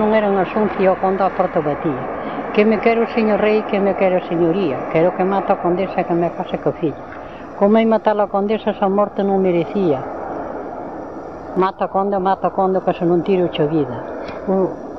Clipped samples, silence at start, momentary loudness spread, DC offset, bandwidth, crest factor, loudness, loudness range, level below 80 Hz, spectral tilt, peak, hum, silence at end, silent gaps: under 0.1%; 0 s; 11 LU; 0.5%; 6.2 kHz; 16 dB; -18 LUFS; 3 LU; -50 dBFS; -9 dB/octave; -2 dBFS; none; 0 s; none